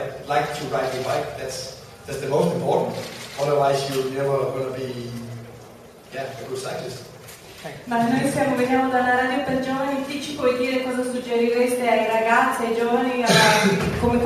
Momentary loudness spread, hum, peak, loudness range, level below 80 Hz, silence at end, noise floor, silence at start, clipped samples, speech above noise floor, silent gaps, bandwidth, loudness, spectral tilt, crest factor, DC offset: 16 LU; none; -4 dBFS; 10 LU; -50 dBFS; 0 s; -44 dBFS; 0 s; under 0.1%; 22 dB; none; 14 kHz; -22 LUFS; -4.5 dB/octave; 18 dB; under 0.1%